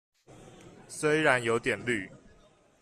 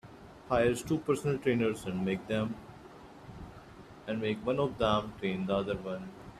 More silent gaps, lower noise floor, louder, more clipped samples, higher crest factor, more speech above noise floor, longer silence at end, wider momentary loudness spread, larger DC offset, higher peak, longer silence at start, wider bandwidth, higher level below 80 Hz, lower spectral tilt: neither; first, -61 dBFS vs -51 dBFS; first, -28 LUFS vs -32 LUFS; neither; about the same, 24 dB vs 20 dB; first, 33 dB vs 20 dB; first, 0.65 s vs 0 s; second, 15 LU vs 22 LU; neither; first, -8 dBFS vs -14 dBFS; first, 0.4 s vs 0.05 s; about the same, 14 kHz vs 14.5 kHz; second, -64 dBFS vs -56 dBFS; second, -4.5 dB/octave vs -6 dB/octave